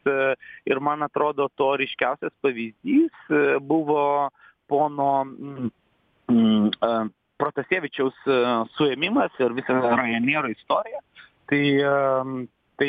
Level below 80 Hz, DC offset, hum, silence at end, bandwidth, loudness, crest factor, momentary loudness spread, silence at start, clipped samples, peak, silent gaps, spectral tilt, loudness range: -68 dBFS; under 0.1%; none; 0 s; 4.9 kHz; -23 LUFS; 16 dB; 11 LU; 0.05 s; under 0.1%; -6 dBFS; none; -8.5 dB/octave; 1 LU